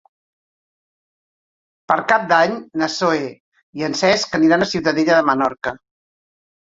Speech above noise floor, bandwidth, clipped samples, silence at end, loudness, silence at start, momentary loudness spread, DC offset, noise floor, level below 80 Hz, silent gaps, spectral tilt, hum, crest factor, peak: over 73 dB; 7.8 kHz; under 0.1%; 1 s; -17 LUFS; 1.9 s; 11 LU; under 0.1%; under -90 dBFS; -58 dBFS; 3.40-3.52 s, 3.63-3.73 s; -4.5 dB/octave; none; 20 dB; 0 dBFS